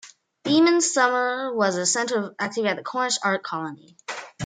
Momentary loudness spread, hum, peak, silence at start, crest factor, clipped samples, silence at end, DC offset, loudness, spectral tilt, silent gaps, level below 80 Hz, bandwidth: 17 LU; none; -6 dBFS; 0.05 s; 18 dB; under 0.1%; 0 s; under 0.1%; -22 LUFS; -3 dB/octave; none; -74 dBFS; 9.6 kHz